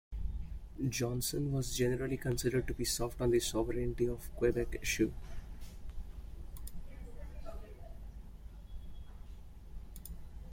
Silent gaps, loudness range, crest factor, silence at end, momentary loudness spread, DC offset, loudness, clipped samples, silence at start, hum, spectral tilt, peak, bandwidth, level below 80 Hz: none; 17 LU; 18 dB; 0 s; 19 LU; under 0.1%; -35 LUFS; under 0.1%; 0.1 s; none; -5 dB/octave; -18 dBFS; 16.5 kHz; -46 dBFS